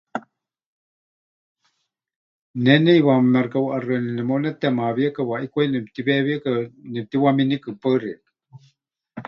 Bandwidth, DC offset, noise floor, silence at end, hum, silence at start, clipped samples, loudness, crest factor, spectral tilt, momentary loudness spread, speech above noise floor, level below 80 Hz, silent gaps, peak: 5.8 kHz; under 0.1%; -74 dBFS; 0.05 s; none; 0.15 s; under 0.1%; -20 LUFS; 20 dB; -9 dB/octave; 16 LU; 54 dB; -66 dBFS; 0.66-1.55 s, 2.16-2.54 s; -2 dBFS